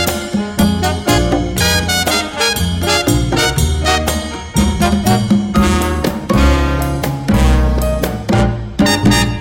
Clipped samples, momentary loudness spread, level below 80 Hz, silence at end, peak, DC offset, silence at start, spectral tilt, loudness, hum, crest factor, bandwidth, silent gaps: under 0.1%; 5 LU; -20 dBFS; 0 s; 0 dBFS; under 0.1%; 0 s; -4.5 dB/octave; -14 LUFS; none; 14 dB; 17 kHz; none